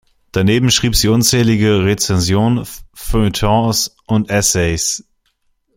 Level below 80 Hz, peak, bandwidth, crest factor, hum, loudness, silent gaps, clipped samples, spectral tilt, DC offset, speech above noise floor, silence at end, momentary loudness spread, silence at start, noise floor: -30 dBFS; 0 dBFS; 16.5 kHz; 14 dB; none; -14 LUFS; none; under 0.1%; -4 dB/octave; under 0.1%; 49 dB; 0.75 s; 9 LU; 0.35 s; -63 dBFS